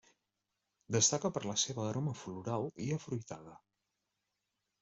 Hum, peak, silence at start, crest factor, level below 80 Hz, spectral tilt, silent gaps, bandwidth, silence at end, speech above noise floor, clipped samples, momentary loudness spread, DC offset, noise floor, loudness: none; -14 dBFS; 0.9 s; 24 dB; -72 dBFS; -3.5 dB/octave; none; 8.2 kHz; 1.25 s; 50 dB; under 0.1%; 13 LU; under 0.1%; -87 dBFS; -35 LUFS